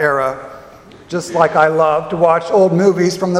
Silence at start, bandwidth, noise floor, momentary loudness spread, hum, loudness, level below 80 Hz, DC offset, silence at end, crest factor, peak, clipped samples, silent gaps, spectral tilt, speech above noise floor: 0 s; 13.5 kHz; -39 dBFS; 12 LU; none; -14 LUFS; -52 dBFS; under 0.1%; 0 s; 14 dB; 0 dBFS; under 0.1%; none; -6 dB/octave; 26 dB